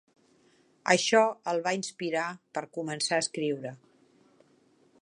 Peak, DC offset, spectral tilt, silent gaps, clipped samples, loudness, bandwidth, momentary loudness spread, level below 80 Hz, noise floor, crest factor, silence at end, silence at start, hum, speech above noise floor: -6 dBFS; under 0.1%; -3 dB/octave; none; under 0.1%; -29 LUFS; 11.5 kHz; 14 LU; -82 dBFS; -65 dBFS; 24 dB; 1.25 s; 0.85 s; none; 36 dB